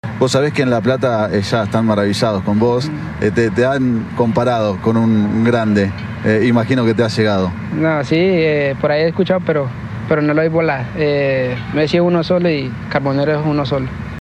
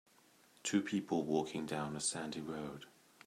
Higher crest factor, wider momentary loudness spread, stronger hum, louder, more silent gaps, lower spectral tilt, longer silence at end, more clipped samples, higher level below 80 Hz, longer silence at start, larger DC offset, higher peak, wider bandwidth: about the same, 14 dB vs 18 dB; second, 5 LU vs 11 LU; neither; first, -16 LUFS vs -39 LUFS; neither; first, -7 dB/octave vs -4 dB/octave; second, 0 s vs 0.4 s; neither; first, -42 dBFS vs -74 dBFS; second, 0.05 s vs 0.65 s; neither; first, 0 dBFS vs -22 dBFS; second, 12.5 kHz vs 14.5 kHz